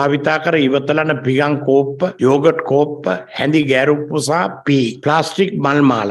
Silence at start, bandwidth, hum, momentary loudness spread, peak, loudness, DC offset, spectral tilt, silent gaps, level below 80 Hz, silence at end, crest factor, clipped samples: 0 s; 12 kHz; none; 4 LU; 0 dBFS; -15 LUFS; under 0.1%; -6 dB/octave; none; -60 dBFS; 0 s; 14 dB; under 0.1%